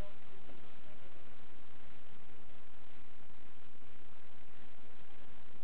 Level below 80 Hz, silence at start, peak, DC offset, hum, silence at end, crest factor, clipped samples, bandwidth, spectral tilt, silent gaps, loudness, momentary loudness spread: -70 dBFS; 0 s; -26 dBFS; 4%; none; 0 s; 18 dB; under 0.1%; 4 kHz; -7.5 dB/octave; none; -60 LUFS; 3 LU